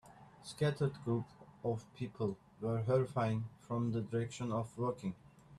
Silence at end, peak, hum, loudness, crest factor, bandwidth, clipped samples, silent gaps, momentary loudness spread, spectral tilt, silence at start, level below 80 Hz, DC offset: 0 s; -20 dBFS; none; -38 LUFS; 18 dB; 12 kHz; under 0.1%; none; 11 LU; -7.5 dB/octave; 0.05 s; -68 dBFS; under 0.1%